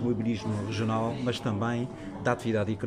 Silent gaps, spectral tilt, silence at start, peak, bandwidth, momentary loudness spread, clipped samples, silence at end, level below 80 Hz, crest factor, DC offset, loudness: none; -6.5 dB/octave; 0 s; -12 dBFS; 11.5 kHz; 4 LU; under 0.1%; 0 s; -56 dBFS; 18 dB; under 0.1%; -30 LUFS